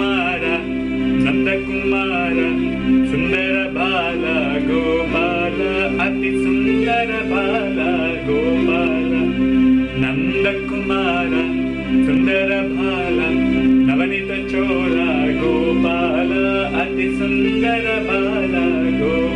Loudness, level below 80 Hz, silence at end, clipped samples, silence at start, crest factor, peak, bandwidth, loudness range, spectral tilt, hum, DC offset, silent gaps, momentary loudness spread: -17 LUFS; -36 dBFS; 0 s; under 0.1%; 0 s; 12 dB; -6 dBFS; 9.4 kHz; 1 LU; -7 dB/octave; none; under 0.1%; none; 4 LU